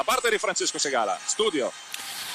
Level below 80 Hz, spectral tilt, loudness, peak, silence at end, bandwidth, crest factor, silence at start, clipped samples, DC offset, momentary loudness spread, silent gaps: -64 dBFS; -0.5 dB/octave; -25 LUFS; -12 dBFS; 0 s; 15.5 kHz; 14 dB; 0 s; under 0.1%; under 0.1%; 9 LU; none